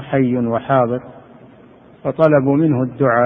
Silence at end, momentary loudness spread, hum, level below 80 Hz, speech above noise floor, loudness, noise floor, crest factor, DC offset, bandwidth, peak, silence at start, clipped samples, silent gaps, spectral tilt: 0 s; 11 LU; none; -54 dBFS; 29 dB; -16 LUFS; -44 dBFS; 16 dB; under 0.1%; 4.6 kHz; 0 dBFS; 0 s; under 0.1%; none; -11 dB/octave